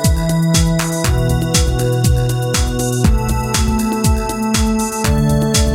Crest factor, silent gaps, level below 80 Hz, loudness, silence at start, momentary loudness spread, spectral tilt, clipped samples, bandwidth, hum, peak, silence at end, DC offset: 14 dB; none; -20 dBFS; -15 LUFS; 0 s; 3 LU; -5 dB/octave; under 0.1%; 17 kHz; none; 0 dBFS; 0 s; under 0.1%